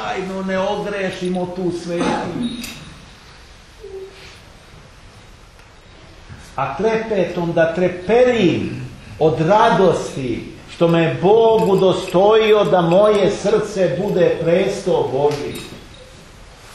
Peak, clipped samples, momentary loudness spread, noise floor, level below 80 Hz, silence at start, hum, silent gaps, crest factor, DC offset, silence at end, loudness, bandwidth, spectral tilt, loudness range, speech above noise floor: -2 dBFS; under 0.1%; 18 LU; -43 dBFS; -46 dBFS; 0 s; none; none; 16 dB; under 0.1%; 0 s; -17 LUFS; 13 kHz; -6 dB/octave; 13 LU; 27 dB